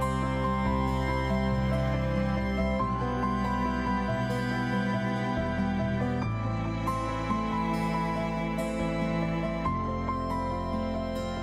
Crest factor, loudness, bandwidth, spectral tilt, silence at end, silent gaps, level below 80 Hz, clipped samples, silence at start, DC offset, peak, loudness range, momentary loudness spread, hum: 12 dB; -29 LUFS; 14.5 kHz; -7.5 dB/octave; 0 s; none; -38 dBFS; under 0.1%; 0 s; under 0.1%; -16 dBFS; 2 LU; 3 LU; none